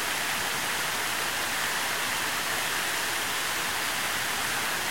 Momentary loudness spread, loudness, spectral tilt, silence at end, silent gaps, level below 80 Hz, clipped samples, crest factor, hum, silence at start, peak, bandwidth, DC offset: 0 LU; -27 LUFS; -0.5 dB/octave; 0 s; none; -60 dBFS; under 0.1%; 14 dB; none; 0 s; -16 dBFS; 16.5 kHz; 0.5%